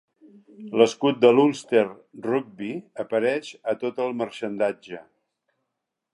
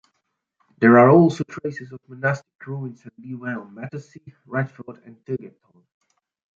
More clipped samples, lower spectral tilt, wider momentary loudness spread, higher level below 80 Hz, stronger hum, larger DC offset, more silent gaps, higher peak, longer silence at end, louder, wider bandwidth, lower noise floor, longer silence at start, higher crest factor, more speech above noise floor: neither; second, -5.5 dB/octave vs -8.5 dB/octave; second, 16 LU vs 24 LU; second, -76 dBFS vs -66 dBFS; neither; neither; second, none vs 2.55-2.59 s; about the same, -2 dBFS vs -2 dBFS; about the same, 1.15 s vs 1.1 s; second, -24 LUFS vs -20 LUFS; first, 11 kHz vs 7.6 kHz; first, -82 dBFS vs -76 dBFS; second, 0.6 s vs 0.8 s; about the same, 22 dB vs 20 dB; first, 59 dB vs 55 dB